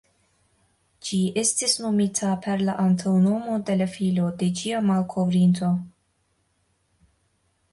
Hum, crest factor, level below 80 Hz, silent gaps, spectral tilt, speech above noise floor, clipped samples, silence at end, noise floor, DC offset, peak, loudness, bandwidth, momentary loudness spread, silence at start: none; 16 dB; -62 dBFS; none; -5 dB/octave; 47 dB; under 0.1%; 1.85 s; -69 dBFS; under 0.1%; -8 dBFS; -23 LUFS; 11.5 kHz; 6 LU; 1.05 s